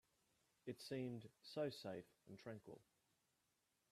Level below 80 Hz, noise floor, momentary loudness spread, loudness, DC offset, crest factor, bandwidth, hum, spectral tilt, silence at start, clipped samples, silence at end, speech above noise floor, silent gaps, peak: -90 dBFS; -87 dBFS; 14 LU; -52 LUFS; under 0.1%; 20 dB; 14 kHz; none; -6 dB/octave; 0.65 s; under 0.1%; 1.1 s; 35 dB; none; -34 dBFS